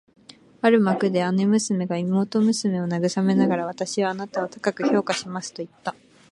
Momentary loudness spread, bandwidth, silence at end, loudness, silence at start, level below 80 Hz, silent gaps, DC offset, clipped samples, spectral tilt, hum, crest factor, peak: 12 LU; 11.5 kHz; 0.4 s; -23 LUFS; 0.65 s; -68 dBFS; none; under 0.1%; under 0.1%; -5.5 dB/octave; none; 20 dB; -4 dBFS